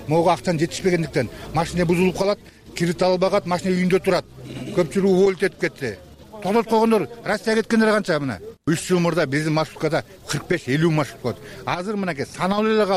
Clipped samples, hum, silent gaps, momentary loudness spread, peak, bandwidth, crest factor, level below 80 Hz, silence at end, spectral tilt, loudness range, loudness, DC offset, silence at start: under 0.1%; none; none; 10 LU; -8 dBFS; 15.5 kHz; 14 dB; -48 dBFS; 0 s; -6 dB/octave; 2 LU; -21 LUFS; under 0.1%; 0 s